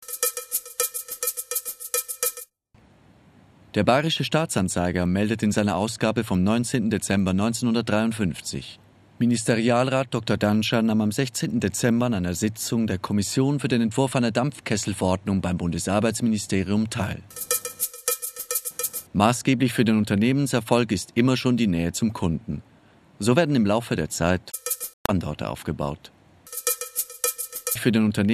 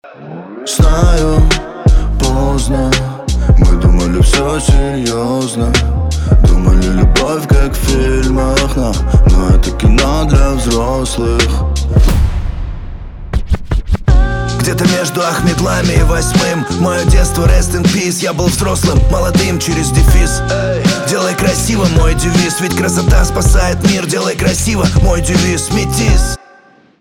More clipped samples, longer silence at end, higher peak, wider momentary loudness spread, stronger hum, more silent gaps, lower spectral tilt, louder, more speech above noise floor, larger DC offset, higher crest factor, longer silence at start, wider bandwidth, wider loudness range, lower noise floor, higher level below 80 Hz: neither; second, 0 s vs 0.65 s; about the same, -2 dBFS vs 0 dBFS; about the same, 7 LU vs 5 LU; neither; first, 24.93-25.05 s vs none; about the same, -5 dB/octave vs -5 dB/octave; second, -24 LUFS vs -12 LUFS; about the same, 35 dB vs 33 dB; neither; first, 22 dB vs 10 dB; about the same, 0 s vs 0.05 s; second, 14 kHz vs 16.5 kHz; about the same, 4 LU vs 2 LU; first, -57 dBFS vs -44 dBFS; second, -52 dBFS vs -14 dBFS